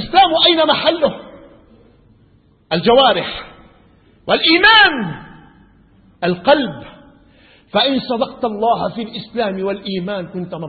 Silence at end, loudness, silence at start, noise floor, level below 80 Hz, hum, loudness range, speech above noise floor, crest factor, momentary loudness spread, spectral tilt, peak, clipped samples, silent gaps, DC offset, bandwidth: 0 s; -14 LUFS; 0 s; -52 dBFS; -48 dBFS; none; 6 LU; 37 dB; 18 dB; 17 LU; -7.5 dB/octave; 0 dBFS; under 0.1%; none; under 0.1%; 4.8 kHz